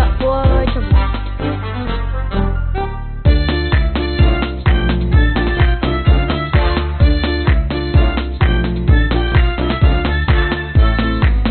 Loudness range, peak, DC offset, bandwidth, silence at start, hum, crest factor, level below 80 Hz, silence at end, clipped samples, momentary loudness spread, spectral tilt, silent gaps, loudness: 3 LU; -2 dBFS; under 0.1%; 4.5 kHz; 0 s; none; 12 dB; -16 dBFS; 0 s; under 0.1%; 7 LU; -5.5 dB/octave; none; -16 LUFS